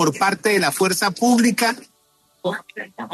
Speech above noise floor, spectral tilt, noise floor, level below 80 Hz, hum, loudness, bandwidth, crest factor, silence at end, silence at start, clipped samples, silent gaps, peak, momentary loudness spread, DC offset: 42 dB; -3.5 dB/octave; -61 dBFS; -66 dBFS; none; -19 LUFS; 13 kHz; 16 dB; 0 s; 0 s; under 0.1%; none; -6 dBFS; 15 LU; under 0.1%